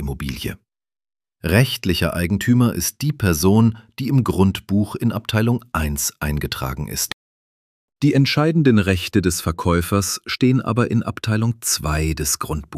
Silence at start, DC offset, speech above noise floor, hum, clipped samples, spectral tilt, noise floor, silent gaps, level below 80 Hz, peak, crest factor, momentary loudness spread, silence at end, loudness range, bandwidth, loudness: 0 s; under 0.1%; over 71 dB; none; under 0.1%; -5 dB/octave; under -90 dBFS; 7.13-7.88 s; -36 dBFS; -2 dBFS; 18 dB; 9 LU; 0 s; 3 LU; 16 kHz; -19 LUFS